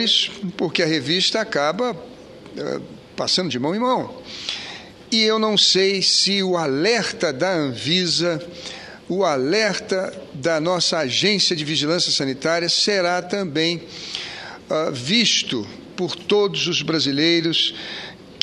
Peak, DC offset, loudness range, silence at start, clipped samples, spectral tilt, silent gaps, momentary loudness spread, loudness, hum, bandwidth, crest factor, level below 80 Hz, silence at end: 0 dBFS; under 0.1%; 4 LU; 0 s; under 0.1%; -3 dB/octave; none; 15 LU; -19 LUFS; none; 11.5 kHz; 20 dB; -62 dBFS; 0 s